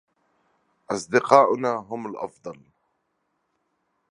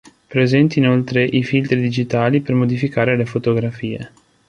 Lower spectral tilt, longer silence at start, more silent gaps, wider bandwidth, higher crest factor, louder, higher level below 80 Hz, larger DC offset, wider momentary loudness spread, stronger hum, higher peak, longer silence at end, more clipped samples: second, -5 dB/octave vs -7.5 dB/octave; first, 0.9 s vs 0.3 s; neither; first, 11 kHz vs 7.2 kHz; first, 26 dB vs 16 dB; second, -22 LUFS vs -17 LUFS; second, -72 dBFS vs -52 dBFS; neither; first, 19 LU vs 10 LU; neither; about the same, 0 dBFS vs -2 dBFS; first, 1.6 s vs 0.4 s; neither